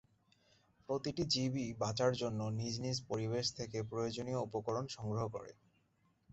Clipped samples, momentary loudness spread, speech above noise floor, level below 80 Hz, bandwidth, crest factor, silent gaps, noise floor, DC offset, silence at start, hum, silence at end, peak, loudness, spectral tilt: under 0.1%; 6 LU; 38 dB; -66 dBFS; 8 kHz; 18 dB; none; -76 dBFS; under 0.1%; 0.9 s; none; 0.8 s; -20 dBFS; -39 LUFS; -5 dB/octave